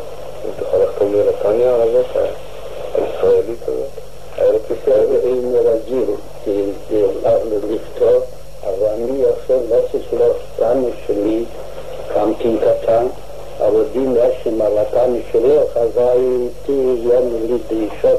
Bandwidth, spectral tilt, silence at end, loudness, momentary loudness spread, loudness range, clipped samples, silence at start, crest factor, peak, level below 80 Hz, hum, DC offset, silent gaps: 14 kHz; -7 dB/octave; 0 s; -17 LUFS; 11 LU; 2 LU; under 0.1%; 0 s; 12 dB; -4 dBFS; -40 dBFS; none; 4%; none